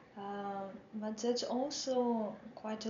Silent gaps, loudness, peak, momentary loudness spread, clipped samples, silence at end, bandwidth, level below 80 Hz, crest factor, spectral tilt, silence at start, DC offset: none; -38 LUFS; -22 dBFS; 11 LU; under 0.1%; 0 s; 7.6 kHz; -78 dBFS; 16 dB; -4 dB/octave; 0 s; under 0.1%